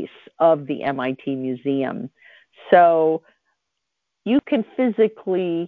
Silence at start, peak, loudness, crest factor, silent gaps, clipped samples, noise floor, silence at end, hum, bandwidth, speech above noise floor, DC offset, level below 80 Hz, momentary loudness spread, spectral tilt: 0 s; -2 dBFS; -20 LUFS; 20 dB; none; under 0.1%; -80 dBFS; 0 s; none; 4.5 kHz; 60 dB; under 0.1%; -66 dBFS; 13 LU; -9.5 dB/octave